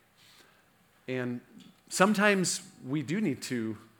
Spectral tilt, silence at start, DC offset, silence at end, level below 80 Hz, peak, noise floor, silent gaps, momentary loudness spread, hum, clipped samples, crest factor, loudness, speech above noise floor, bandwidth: -4 dB/octave; 1.1 s; under 0.1%; 0.15 s; -80 dBFS; -6 dBFS; -65 dBFS; none; 14 LU; none; under 0.1%; 26 dB; -29 LUFS; 35 dB; 18 kHz